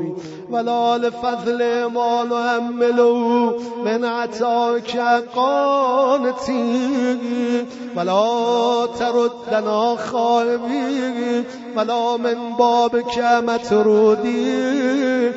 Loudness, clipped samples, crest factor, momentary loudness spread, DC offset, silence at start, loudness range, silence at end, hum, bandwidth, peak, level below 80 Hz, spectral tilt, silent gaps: -19 LUFS; under 0.1%; 14 dB; 6 LU; under 0.1%; 0 s; 2 LU; 0 s; none; 8 kHz; -4 dBFS; -60 dBFS; -3 dB/octave; none